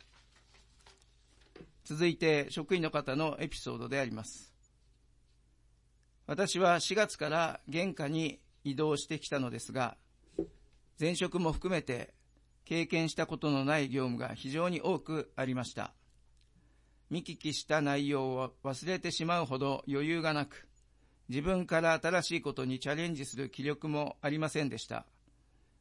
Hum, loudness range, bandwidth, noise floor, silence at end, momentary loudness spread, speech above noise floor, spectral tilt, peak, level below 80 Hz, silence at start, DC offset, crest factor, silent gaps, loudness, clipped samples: none; 4 LU; 11.5 kHz; -68 dBFS; 0.8 s; 11 LU; 34 dB; -5 dB/octave; -16 dBFS; -60 dBFS; 0.85 s; under 0.1%; 20 dB; none; -34 LUFS; under 0.1%